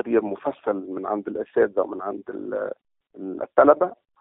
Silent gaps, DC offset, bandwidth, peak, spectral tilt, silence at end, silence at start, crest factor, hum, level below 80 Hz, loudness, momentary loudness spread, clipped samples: none; under 0.1%; 3.9 kHz; -2 dBFS; -6 dB/octave; 0.25 s; 0.05 s; 22 dB; none; -66 dBFS; -24 LUFS; 16 LU; under 0.1%